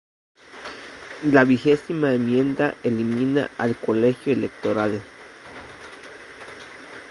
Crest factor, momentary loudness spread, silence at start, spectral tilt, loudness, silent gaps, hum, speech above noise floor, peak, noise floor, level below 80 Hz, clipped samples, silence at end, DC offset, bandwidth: 22 dB; 22 LU; 0.55 s; -7 dB/octave; -21 LUFS; none; none; 21 dB; -2 dBFS; -42 dBFS; -60 dBFS; under 0.1%; 0 s; under 0.1%; 11.5 kHz